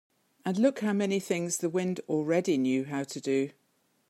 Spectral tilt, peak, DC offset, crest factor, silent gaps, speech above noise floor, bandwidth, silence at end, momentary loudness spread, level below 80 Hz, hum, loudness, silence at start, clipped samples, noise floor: -5.5 dB/octave; -12 dBFS; under 0.1%; 18 dB; none; 43 dB; 15.5 kHz; 0.6 s; 7 LU; -80 dBFS; none; -29 LUFS; 0.45 s; under 0.1%; -72 dBFS